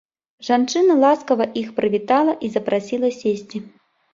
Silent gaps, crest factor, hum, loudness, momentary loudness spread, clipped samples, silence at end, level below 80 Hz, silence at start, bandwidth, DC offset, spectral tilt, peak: none; 16 dB; none; -19 LUFS; 10 LU; under 0.1%; 0.45 s; -64 dBFS; 0.4 s; 7.8 kHz; under 0.1%; -5 dB/octave; -2 dBFS